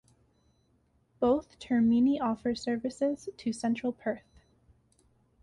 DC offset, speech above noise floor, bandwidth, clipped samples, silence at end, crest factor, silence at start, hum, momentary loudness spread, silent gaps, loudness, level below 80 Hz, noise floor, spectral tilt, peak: under 0.1%; 41 dB; 11 kHz; under 0.1%; 1.25 s; 16 dB; 1.2 s; none; 11 LU; none; -30 LUFS; -62 dBFS; -70 dBFS; -6 dB/octave; -16 dBFS